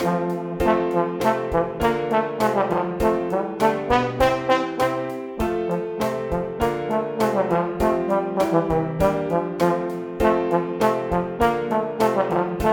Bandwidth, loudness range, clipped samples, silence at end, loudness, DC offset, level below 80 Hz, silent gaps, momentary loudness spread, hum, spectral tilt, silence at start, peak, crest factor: 17.5 kHz; 2 LU; under 0.1%; 0 s; -22 LUFS; under 0.1%; -40 dBFS; none; 5 LU; none; -6.5 dB/octave; 0 s; -2 dBFS; 18 dB